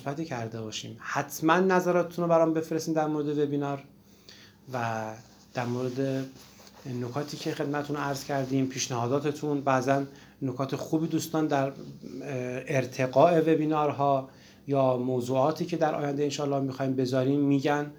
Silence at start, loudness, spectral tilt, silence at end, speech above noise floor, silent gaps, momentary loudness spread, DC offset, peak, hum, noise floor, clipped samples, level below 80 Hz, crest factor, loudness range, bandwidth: 0 s; -28 LUFS; -6 dB/octave; 0 s; 25 dB; none; 12 LU; under 0.1%; -6 dBFS; none; -53 dBFS; under 0.1%; -68 dBFS; 22 dB; 7 LU; over 20 kHz